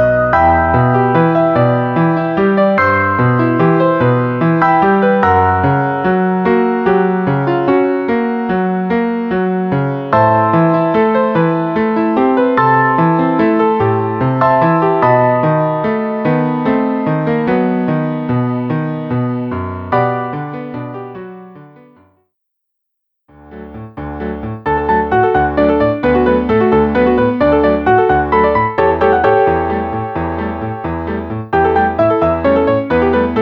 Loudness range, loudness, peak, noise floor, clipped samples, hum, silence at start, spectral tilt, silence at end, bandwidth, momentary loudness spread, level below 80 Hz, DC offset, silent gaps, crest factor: 8 LU; -13 LUFS; -2 dBFS; -73 dBFS; under 0.1%; none; 0 s; -10 dB/octave; 0 s; 5.8 kHz; 9 LU; -36 dBFS; under 0.1%; none; 12 dB